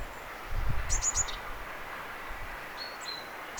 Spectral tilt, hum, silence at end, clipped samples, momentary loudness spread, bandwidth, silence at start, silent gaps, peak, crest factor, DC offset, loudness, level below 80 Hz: -1.5 dB/octave; none; 0 s; under 0.1%; 12 LU; over 20 kHz; 0 s; none; -16 dBFS; 20 dB; under 0.1%; -35 LUFS; -40 dBFS